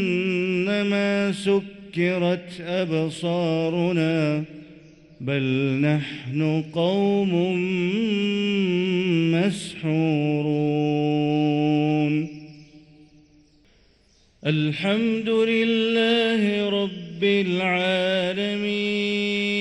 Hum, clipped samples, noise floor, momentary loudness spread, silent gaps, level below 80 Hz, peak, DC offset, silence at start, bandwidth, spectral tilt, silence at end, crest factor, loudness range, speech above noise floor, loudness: none; under 0.1%; -59 dBFS; 5 LU; none; -62 dBFS; -10 dBFS; under 0.1%; 0 s; 11.5 kHz; -6.5 dB/octave; 0 s; 14 dB; 4 LU; 37 dB; -23 LUFS